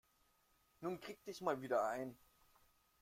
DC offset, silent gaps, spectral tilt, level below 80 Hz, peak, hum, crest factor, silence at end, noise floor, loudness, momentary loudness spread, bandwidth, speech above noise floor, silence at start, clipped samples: under 0.1%; none; -5.5 dB/octave; -80 dBFS; -24 dBFS; none; 22 dB; 0.85 s; -77 dBFS; -43 LUFS; 11 LU; 16.5 kHz; 34 dB; 0.8 s; under 0.1%